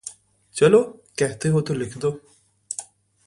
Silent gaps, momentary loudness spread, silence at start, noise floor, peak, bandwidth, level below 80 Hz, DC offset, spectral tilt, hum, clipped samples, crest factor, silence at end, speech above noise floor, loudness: none; 18 LU; 0.05 s; -43 dBFS; -4 dBFS; 11.5 kHz; -58 dBFS; under 0.1%; -5.5 dB/octave; none; under 0.1%; 20 dB; 0.45 s; 23 dB; -22 LUFS